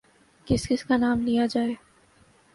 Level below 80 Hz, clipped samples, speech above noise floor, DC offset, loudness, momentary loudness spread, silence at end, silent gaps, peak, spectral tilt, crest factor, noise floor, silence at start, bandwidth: -48 dBFS; under 0.1%; 35 dB; under 0.1%; -25 LUFS; 6 LU; 0.8 s; none; -8 dBFS; -5.5 dB/octave; 18 dB; -59 dBFS; 0.45 s; 11.5 kHz